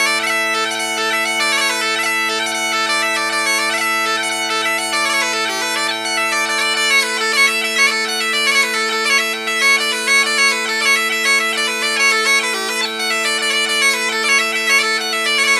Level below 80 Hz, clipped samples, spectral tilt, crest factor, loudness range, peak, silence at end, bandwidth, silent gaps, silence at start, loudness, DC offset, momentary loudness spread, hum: -76 dBFS; under 0.1%; 0.5 dB/octave; 16 dB; 2 LU; -2 dBFS; 0 s; 16 kHz; none; 0 s; -14 LUFS; under 0.1%; 4 LU; none